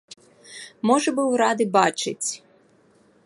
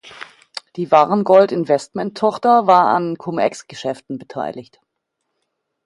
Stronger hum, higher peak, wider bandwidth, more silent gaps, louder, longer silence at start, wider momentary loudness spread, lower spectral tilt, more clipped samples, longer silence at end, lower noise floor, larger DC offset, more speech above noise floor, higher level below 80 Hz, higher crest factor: neither; second, -4 dBFS vs 0 dBFS; about the same, 11.5 kHz vs 11.5 kHz; neither; second, -22 LUFS vs -16 LUFS; first, 0.5 s vs 0.05 s; about the same, 20 LU vs 19 LU; second, -3.5 dB/octave vs -6 dB/octave; neither; second, 0.9 s vs 1.25 s; second, -58 dBFS vs -76 dBFS; neither; second, 37 dB vs 59 dB; second, -76 dBFS vs -66 dBFS; about the same, 20 dB vs 18 dB